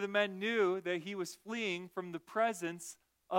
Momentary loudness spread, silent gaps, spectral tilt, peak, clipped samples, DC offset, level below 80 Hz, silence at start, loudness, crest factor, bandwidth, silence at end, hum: 11 LU; none; -4 dB/octave; -18 dBFS; under 0.1%; under 0.1%; -84 dBFS; 0 s; -36 LUFS; 20 dB; 16.5 kHz; 0 s; none